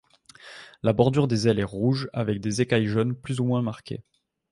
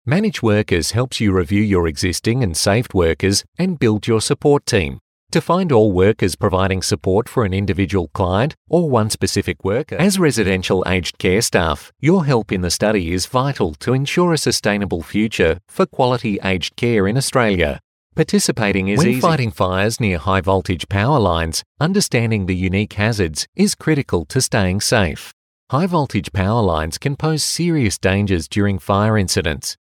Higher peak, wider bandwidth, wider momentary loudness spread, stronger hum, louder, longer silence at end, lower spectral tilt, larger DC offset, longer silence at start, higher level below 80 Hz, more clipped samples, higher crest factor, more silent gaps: about the same, -4 dBFS vs -2 dBFS; second, 11.5 kHz vs 17 kHz; first, 17 LU vs 5 LU; neither; second, -25 LUFS vs -17 LUFS; first, 0.5 s vs 0.15 s; first, -6.5 dB/octave vs -5 dB/octave; neither; first, 0.45 s vs 0.05 s; second, -54 dBFS vs -42 dBFS; neither; first, 22 dB vs 16 dB; second, none vs 3.48-3.52 s, 5.01-5.27 s, 8.57-8.65 s, 17.84-18.10 s, 21.66-21.75 s, 23.48-23.53 s, 25.33-25.67 s